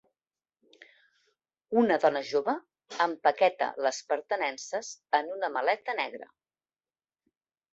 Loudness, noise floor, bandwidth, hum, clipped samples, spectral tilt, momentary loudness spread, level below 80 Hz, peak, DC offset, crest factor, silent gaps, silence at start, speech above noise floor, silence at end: -29 LUFS; under -90 dBFS; 8 kHz; none; under 0.1%; -3 dB/octave; 11 LU; -80 dBFS; -8 dBFS; under 0.1%; 22 dB; none; 1.7 s; over 62 dB; 1.5 s